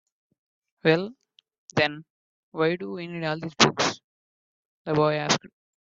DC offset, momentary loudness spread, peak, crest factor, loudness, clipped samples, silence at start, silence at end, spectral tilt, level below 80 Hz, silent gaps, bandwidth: under 0.1%; 17 LU; -2 dBFS; 26 dB; -25 LUFS; under 0.1%; 0.85 s; 0.35 s; -4 dB/octave; -66 dBFS; 1.58-1.68 s, 2.10-2.52 s, 4.04-4.85 s; 8 kHz